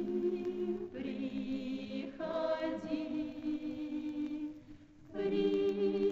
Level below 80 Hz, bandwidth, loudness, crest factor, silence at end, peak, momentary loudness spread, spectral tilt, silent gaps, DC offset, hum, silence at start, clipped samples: -66 dBFS; 7.4 kHz; -37 LUFS; 14 dB; 0 s; -22 dBFS; 10 LU; -7.5 dB/octave; none; under 0.1%; none; 0 s; under 0.1%